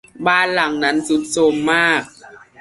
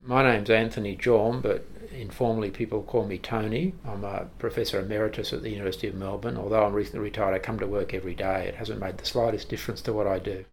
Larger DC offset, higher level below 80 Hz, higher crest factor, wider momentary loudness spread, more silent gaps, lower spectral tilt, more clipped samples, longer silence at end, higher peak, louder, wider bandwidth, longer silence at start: neither; second, -58 dBFS vs -46 dBFS; second, 16 dB vs 22 dB; second, 4 LU vs 10 LU; neither; second, -3.5 dB/octave vs -6 dB/octave; neither; first, 0.25 s vs 0.1 s; about the same, -2 dBFS vs -4 dBFS; first, -16 LUFS vs -28 LUFS; second, 11.5 kHz vs 18 kHz; first, 0.15 s vs 0 s